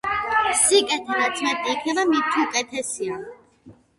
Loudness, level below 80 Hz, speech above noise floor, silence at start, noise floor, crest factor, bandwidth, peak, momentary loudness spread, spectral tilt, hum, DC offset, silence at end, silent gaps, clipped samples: -21 LUFS; -58 dBFS; 28 dB; 0.05 s; -50 dBFS; 18 dB; 11.5 kHz; -4 dBFS; 12 LU; -1 dB/octave; none; under 0.1%; 0.25 s; none; under 0.1%